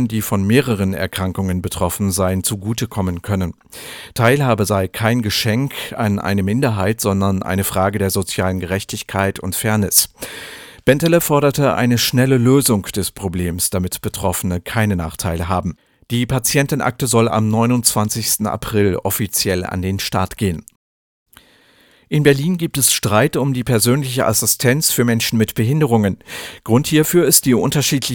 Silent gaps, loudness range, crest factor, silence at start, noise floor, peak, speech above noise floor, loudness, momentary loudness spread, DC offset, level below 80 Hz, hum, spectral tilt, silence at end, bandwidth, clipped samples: 20.76-21.26 s; 5 LU; 18 dB; 0 s; -52 dBFS; 0 dBFS; 35 dB; -17 LUFS; 8 LU; under 0.1%; -42 dBFS; none; -4.5 dB/octave; 0 s; over 20 kHz; under 0.1%